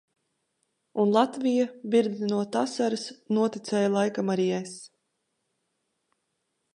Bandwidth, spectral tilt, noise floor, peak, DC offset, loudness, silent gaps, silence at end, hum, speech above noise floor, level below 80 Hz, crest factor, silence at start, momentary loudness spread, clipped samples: 11 kHz; -5.5 dB/octave; -78 dBFS; -8 dBFS; under 0.1%; -26 LUFS; none; 1.9 s; none; 53 dB; -80 dBFS; 20 dB; 0.95 s; 9 LU; under 0.1%